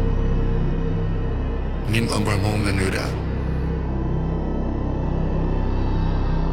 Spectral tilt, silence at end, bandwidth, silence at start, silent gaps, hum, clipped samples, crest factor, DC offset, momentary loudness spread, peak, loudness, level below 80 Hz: -6.5 dB/octave; 0 s; 13.5 kHz; 0 s; none; none; under 0.1%; 14 dB; under 0.1%; 4 LU; -6 dBFS; -24 LUFS; -24 dBFS